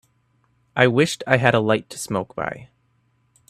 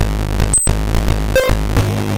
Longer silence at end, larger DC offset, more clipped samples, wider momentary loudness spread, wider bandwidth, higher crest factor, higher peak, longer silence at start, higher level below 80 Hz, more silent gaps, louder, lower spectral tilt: first, 0.85 s vs 0 s; neither; neither; first, 13 LU vs 5 LU; second, 13.5 kHz vs 17 kHz; first, 22 dB vs 14 dB; about the same, 0 dBFS vs -2 dBFS; first, 0.75 s vs 0 s; second, -58 dBFS vs -18 dBFS; neither; second, -20 LUFS vs -16 LUFS; about the same, -5 dB/octave vs -4.5 dB/octave